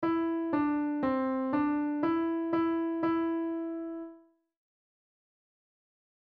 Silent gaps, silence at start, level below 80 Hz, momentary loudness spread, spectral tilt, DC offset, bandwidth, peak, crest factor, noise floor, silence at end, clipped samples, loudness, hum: none; 0 s; -66 dBFS; 8 LU; -9 dB/octave; under 0.1%; 4.7 kHz; -18 dBFS; 14 dB; -57 dBFS; 2.1 s; under 0.1%; -31 LUFS; none